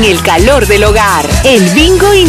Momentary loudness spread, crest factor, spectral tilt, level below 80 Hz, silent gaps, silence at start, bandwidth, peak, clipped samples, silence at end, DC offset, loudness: 3 LU; 6 dB; -4 dB/octave; -16 dBFS; none; 0 s; 15.5 kHz; 0 dBFS; 3%; 0 s; under 0.1%; -6 LUFS